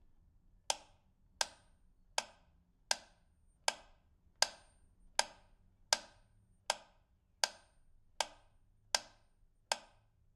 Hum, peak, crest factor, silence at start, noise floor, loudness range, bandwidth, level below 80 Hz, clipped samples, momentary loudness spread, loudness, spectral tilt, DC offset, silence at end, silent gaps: none; -10 dBFS; 36 dB; 0.7 s; -72 dBFS; 3 LU; 15.5 kHz; -70 dBFS; under 0.1%; 6 LU; -39 LUFS; 1.5 dB/octave; under 0.1%; 0.55 s; none